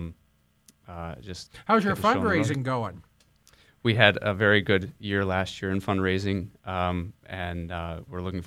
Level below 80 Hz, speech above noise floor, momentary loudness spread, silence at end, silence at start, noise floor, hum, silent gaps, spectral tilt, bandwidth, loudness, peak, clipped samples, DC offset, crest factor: -52 dBFS; 39 dB; 17 LU; 0 s; 0 s; -65 dBFS; none; none; -6 dB/octave; 15 kHz; -26 LUFS; -2 dBFS; under 0.1%; under 0.1%; 26 dB